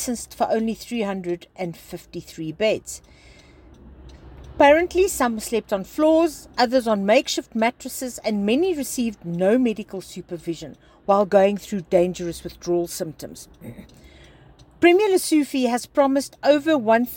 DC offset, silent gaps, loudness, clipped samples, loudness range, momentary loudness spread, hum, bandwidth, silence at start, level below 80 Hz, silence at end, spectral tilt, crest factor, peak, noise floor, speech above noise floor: under 0.1%; none; -21 LUFS; under 0.1%; 7 LU; 17 LU; none; 17 kHz; 0 s; -50 dBFS; 0 s; -4.5 dB/octave; 18 dB; -4 dBFS; -50 dBFS; 28 dB